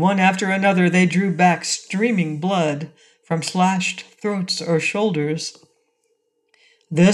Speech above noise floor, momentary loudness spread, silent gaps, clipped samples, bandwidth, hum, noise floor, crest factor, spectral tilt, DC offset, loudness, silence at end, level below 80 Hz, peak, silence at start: 49 dB; 10 LU; none; under 0.1%; 11.5 kHz; none; -68 dBFS; 16 dB; -5 dB/octave; under 0.1%; -20 LUFS; 0 s; -66 dBFS; -4 dBFS; 0 s